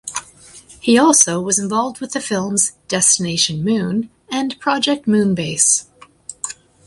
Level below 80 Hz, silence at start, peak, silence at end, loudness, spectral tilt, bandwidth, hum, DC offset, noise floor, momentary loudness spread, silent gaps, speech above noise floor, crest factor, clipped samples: -56 dBFS; 0.05 s; 0 dBFS; 0.35 s; -16 LUFS; -3 dB/octave; 11.5 kHz; none; under 0.1%; -43 dBFS; 15 LU; none; 26 dB; 18 dB; under 0.1%